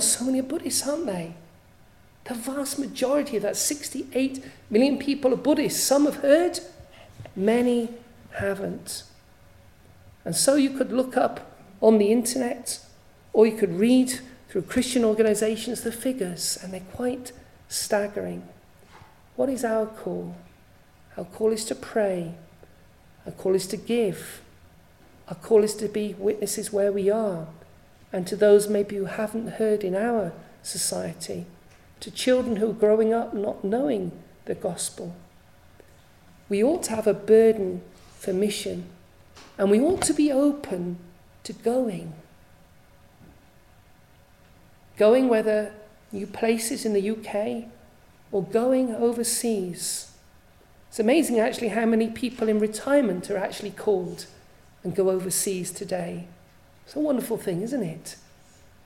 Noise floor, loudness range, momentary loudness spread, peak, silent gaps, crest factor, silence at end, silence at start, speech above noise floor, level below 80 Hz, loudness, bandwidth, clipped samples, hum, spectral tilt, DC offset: -55 dBFS; 7 LU; 17 LU; -4 dBFS; none; 20 dB; 0.7 s; 0 s; 31 dB; -58 dBFS; -25 LUFS; 16 kHz; under 0.1%; none; -4 dB/octave; under 0.1%